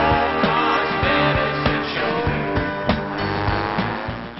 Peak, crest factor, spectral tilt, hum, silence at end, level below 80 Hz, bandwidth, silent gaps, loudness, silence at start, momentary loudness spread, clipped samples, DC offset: -4 dBFS; 16 dB; -3.5 dB/octave; none; 0 s; -36 dBFS; 6 kHz; none; -20 LUFS; 0 s; 5 LU; under 0.1%; under 0.1%